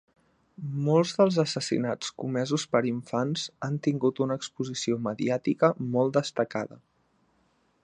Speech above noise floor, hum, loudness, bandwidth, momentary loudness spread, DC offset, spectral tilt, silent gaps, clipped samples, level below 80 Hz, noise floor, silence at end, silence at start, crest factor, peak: 42 dB; none; -28 LUFS; 11 kHz; 9 LU; under 0.1%; -5.5 dB/octave; none; under 0.1%; -70 dBFS; -69 dBFS; 1.05 s; 0.6 s; 20 dB; -6 dBFS